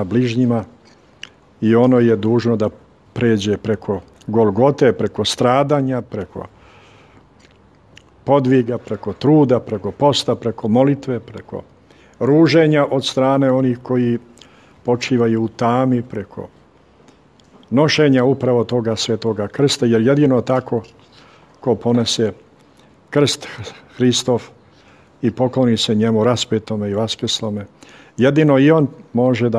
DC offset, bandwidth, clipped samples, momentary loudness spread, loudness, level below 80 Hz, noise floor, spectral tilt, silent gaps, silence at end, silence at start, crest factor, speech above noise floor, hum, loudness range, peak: under 0.1%; 12.5 kHz; under 0.1%; 15 LU; -17 LUFS; -56 dBFS; -50 dBFS; -6 dB/octave; none; 0 s; 0 s; 16 dB; 34 dB; none; 4 LU; 0 dBFS